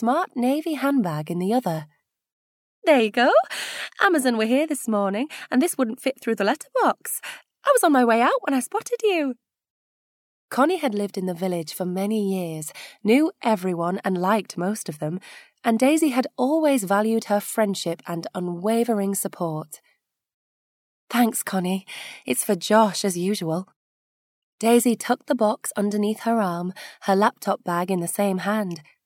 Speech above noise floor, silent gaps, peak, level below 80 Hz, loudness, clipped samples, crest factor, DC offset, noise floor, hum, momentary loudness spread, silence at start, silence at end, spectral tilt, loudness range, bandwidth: 46 dB; 2.32-2.82 s, 9.70-10.49 s, 20.34-21.07 s, 23.76-24.58 s; -4 dBFS; -78 dBFS; -23 LUFS; under 0.1%; 20 dB; under 0.1%; -68 dBFS; none; 11 LU; 0 s; 0.25 s; -4.5 dB/octave; 5 LU; 17.5 kHz